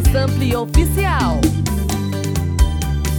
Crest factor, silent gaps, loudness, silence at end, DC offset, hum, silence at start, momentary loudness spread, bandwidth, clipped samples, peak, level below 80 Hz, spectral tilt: 16 dB; none; -18 LUFS; 0 s; under 0.1%; none; 0 s; 4 LU; over 20 kHz; under 0.1%; 0 dBFS; -20 dBFS; -6 dB/octave